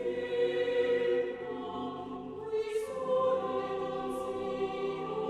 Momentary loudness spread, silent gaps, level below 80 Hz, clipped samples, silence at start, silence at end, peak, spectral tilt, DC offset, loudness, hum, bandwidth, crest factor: 9 LU; none; -66 dBFS; under 0.1%; 0 s; 0 s; -20 dBFS; -5.5 dB/octave; under 0.1%; -33 LUFS; none; 12.5 kHz; 14 dB